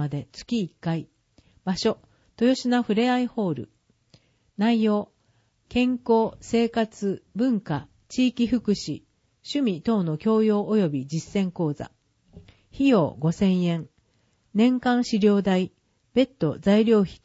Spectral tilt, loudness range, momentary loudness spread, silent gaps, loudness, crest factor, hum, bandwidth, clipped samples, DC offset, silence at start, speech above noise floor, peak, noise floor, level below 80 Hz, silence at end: -6.5 dB/octave; 3 LU; 12 LU; none; -24 LUFS; 16 dB; none; 8 kHz; under 0.1%; under 0.1%; 0 s; 44 dB; -8 dBFS; -67 dBFS; -56 dBFS; 0.1 s